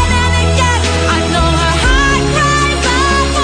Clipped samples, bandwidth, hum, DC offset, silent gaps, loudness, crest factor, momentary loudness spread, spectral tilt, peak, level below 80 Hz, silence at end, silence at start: under 0.1%; 10.5 kHz; none; under 0.1%; none; -11 LUFS; 12 dB; 2 LU; -4 dB/octave; 0 dBFS; -18 dBFS; 0 s; 0 s